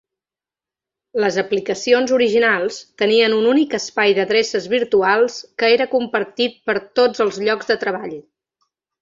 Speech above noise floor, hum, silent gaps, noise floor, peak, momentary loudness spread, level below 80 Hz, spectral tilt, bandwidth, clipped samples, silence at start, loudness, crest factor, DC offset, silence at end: 73 dB; none; none; -90 dBFS; -2 dBFS; 7 LU; -64 dBFS; -3.5 dB/octave; 7.8 kHz; under 0.1%; 1.15 s; -17 LUFS; 16 dB; under 0.1%; 0.8 s